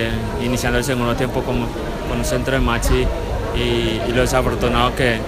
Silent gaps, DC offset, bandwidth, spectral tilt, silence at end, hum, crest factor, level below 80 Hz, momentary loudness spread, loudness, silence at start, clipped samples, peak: none; under 0.1%; 15.5 kHz; -5 dB/octave; 0 s; none; 16 dB; -26 dBFS; 6 LU; -19 LUFS; 0 s; under 0.1%; -2 dBFS